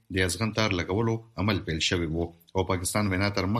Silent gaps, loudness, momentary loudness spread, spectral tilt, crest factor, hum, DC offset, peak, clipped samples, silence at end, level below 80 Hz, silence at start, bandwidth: none; -27 LUFS; 5 LU; -4.5 dB/octave; 20 dB; none; under 0.1%; -8 dBFS; under 0.1%; 0 s; -48 dBFS; 0.1 s; 14 kHz